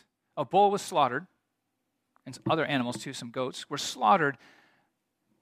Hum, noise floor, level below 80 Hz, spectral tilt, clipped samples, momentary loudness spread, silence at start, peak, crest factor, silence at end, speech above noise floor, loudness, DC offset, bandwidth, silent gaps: none; -81 dBFS; -76 dBFS; -4.5 dB/octave; under 0.1%; 14 LU; 0.35 s; -10 dBFS; 20 dB; 1.05 s; 53 dB; -28 LUFS; under 0.1%; 15.5 kHz; none